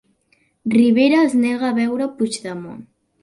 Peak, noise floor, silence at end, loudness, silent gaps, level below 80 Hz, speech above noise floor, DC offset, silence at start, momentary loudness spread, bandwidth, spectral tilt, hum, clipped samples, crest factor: -4 dBFS; -62 dBFS; 0.4 s; -17 LUFS; none; -62 dBFS; 45 dB; under 0.1%; 0.65 s; 16 LU; 11.5 kHz; -5 dB/octave; none; under 0.1%; 14 dB